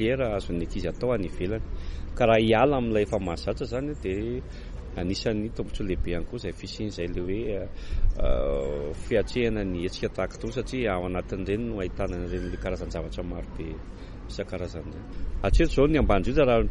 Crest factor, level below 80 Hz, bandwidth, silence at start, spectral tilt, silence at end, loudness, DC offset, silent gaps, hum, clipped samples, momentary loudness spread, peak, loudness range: 18 dB; -32 dBFS; 11 kHz; 0 s; -6.5 dB/octave; 0 s; -28 LUFS; under 0.1%; none; none; under 0.1%; 15 LU; -8 dBFS; 7 LU